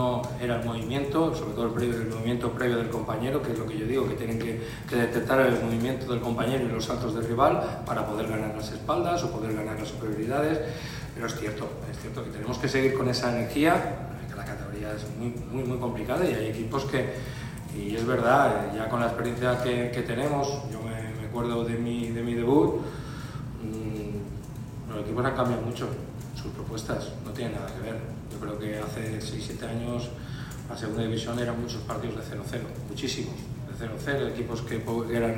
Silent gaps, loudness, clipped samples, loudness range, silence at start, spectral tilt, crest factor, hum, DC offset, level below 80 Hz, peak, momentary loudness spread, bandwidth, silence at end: none; -29 LUFS; under 0.1%; 6 LU; 0 s; -6 dB/octave; 22 dB; none; under 0.1%; -46 dBFS; -8 dBFS; 12 LU; 16 kHz; 0 s